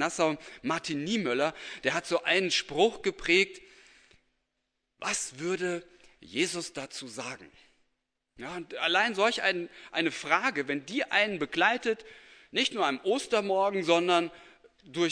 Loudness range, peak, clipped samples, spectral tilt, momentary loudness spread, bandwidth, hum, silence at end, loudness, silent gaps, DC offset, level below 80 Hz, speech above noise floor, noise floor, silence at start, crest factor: 7 LU; -8 dBFS; under 0.1%; -3 dB/octave; 13 LU; 10.5 kHz; none; 0 s; -29 LUFS; none; under 0.1%; -66 dBFS; 53 dB; -82 dBFS; 0 s; 24 dB